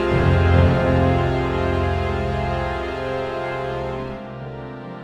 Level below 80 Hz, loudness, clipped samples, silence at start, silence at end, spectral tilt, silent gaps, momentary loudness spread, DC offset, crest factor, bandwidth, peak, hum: -30 dBFS; -21 LUFS; under 0.1%; 0 s; 0 s; -8 dB/octave; none; 16 LU; under 0.1%; 16 dB; 8.2 kHz; -4 dBFS; none